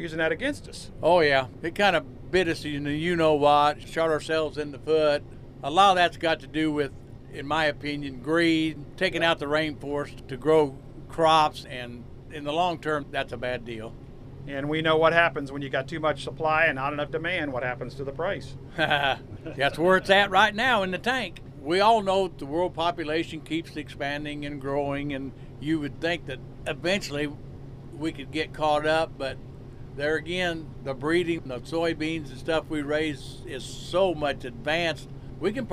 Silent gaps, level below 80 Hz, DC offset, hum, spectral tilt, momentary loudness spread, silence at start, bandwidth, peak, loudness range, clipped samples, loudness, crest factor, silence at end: none; -48 dBFS; under 0.1%; none; -5 dB/octave; 16 LU; 0 s; 14.5 kHz; -6 dBFS; 7 LU; under 0.1%; -26 LUFS; 22 dB; 0 s